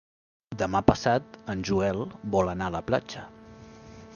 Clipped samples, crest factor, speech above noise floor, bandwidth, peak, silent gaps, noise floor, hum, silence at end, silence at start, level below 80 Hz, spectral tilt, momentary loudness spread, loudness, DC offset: under 0.1%; 26 dB; 21 dB; 7.2 kHz; -2 dBFS; none; -48 dBFS; none; 0 s; 0.5 s; -48 dBFS; -6 dB/octave; 22 LU; -27 LUFS; under 0.1%